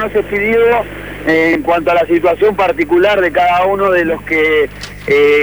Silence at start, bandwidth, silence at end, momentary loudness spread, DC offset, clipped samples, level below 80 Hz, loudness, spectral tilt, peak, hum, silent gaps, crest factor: 0 s; over 20 kHz; 0 s; 5 LU; 0.4%; under 0.1%; -38 dBFS; -12 LUFS; -6 dB/octave; -2 dBFS; 50 Hz at -35 dBFS; none; 10 dB